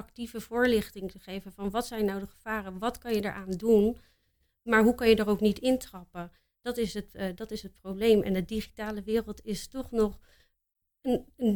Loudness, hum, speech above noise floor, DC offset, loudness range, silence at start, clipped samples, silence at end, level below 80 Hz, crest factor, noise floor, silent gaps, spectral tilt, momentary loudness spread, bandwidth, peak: -29 LUFS; none; 45 dB; under 0.1%; 5 LU; 0 s; under 0.1%; 0 s; -52 dBFS; 20 dB; -73 dBFS; none; -5.5 dB/octave; 16 LU; 19 kHz; -10 dBFS